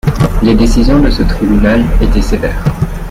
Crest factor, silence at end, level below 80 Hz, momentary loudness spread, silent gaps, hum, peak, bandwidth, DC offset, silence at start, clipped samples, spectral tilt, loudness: 8 dB; 0 s; -14 dBFS; 6 LU; none; none; 0 dBFS; 15 kHz; under 0.1%; 0.05 s; under 0.1%; -7 dB/octave; -11 LUFS